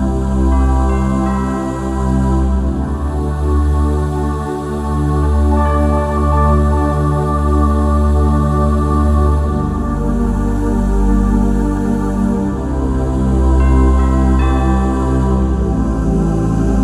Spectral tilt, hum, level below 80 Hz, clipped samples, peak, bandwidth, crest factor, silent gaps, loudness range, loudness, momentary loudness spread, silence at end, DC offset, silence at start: -8.5 dB/octave; none; -16 dBFS; under 0.1%; -2 dBFS; 11 kHz; 12 dB; none; 3 LU; -15 LUFS; 5 LU; 0 s; under 0.1%; 0 s